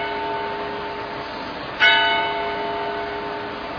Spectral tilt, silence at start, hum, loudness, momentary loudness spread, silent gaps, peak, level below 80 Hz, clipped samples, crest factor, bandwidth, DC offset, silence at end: -4 dB/octave; 0 s; none; -22 LUFS; 14 LU; none; -2 dBFS; -50 dBFS; under 0.1%; 20 dB; 5.4 kHz; under 0.1%; 0 s